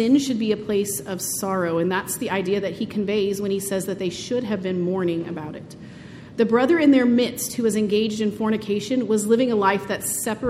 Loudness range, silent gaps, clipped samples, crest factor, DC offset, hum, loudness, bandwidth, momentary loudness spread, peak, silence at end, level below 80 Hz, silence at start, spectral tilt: 5 LU; none; under 0.1%; 18 dB; under 0.1%; none; -22 LUFS; 16 kHz; 10 LU; -4 dBFS; 0 s; -56 dBFS; 0 s; -4.5 dB/octave